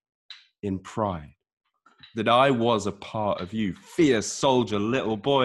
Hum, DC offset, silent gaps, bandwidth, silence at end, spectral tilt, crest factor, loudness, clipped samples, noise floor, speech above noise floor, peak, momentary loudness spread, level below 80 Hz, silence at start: none; under 0.1%; 1.53-1.57 s; 12.5 kHz; 0 s; -5 dB/octave; 18 dB; -25 LUFS; under 0.1%; -55 dBFS; 31 dB; -6 dBFS; 12 LU; -60 dBFS; 0.3 s